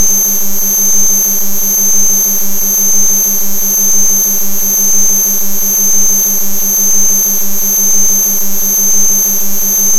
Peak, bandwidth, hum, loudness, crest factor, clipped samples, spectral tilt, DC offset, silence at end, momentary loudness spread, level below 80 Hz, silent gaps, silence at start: 0 dBFS; 20 kHz; none; -8 LUFS; 8 dB; 0.2%; -1 dB/octave; under 0.1%; 0 s; 4 LU; -42 dBFS; none; 0 s